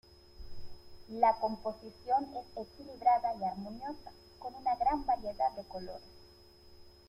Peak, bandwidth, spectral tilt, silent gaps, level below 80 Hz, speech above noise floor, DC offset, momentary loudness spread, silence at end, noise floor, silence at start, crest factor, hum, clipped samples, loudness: -14 dBFS; 13.5 kHz; -6.5 dB/octave; none; -58 dBFS; 24 dB; under 0.1%; 20 LU; 0.2 s; -58 dBFS; 0.3 s; 22 dB; none; under 0.1%; -34 LUFS